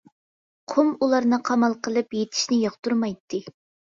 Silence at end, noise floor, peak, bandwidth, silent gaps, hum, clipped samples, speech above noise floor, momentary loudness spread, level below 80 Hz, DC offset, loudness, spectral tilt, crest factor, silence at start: 0.45 s; under -90 dBFS; -8 dBFS; 7.6 kHz; 2.79-2.83 s, 3.20-3.28 s; none; under 0.1%; over 67 dB; 8 LU; -68 dBFS; under 0.1%; -23 LUFS; -4 dB/octave; 18 dB; 0.7 s